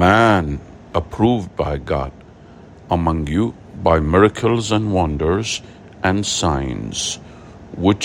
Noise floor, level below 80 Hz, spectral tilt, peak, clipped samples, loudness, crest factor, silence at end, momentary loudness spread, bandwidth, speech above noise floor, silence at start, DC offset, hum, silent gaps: -42 dBFS; -36 dBFS; -5 dB/octave; 0 dBFS; under 0.1%; -19 LUFS; 18 dB; 0 s; 10 LU; 16 kHz; 24 dB; 0 s; under 0.1%; none; none